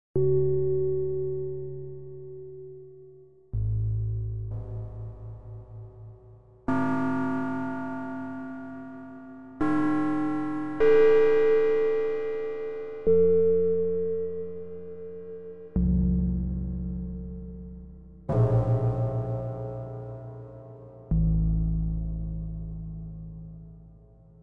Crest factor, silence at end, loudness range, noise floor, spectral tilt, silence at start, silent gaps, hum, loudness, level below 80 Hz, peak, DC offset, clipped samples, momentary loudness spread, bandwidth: 16 dB; 0 s; 11 LU; -53 dBFS; -10 dB/octave; 0.15 s; none; none; -27 LUFS; -38 dBFS; -10 dBFS; under 0.1%; under 0.1%; 21 LU; 5.6 kHz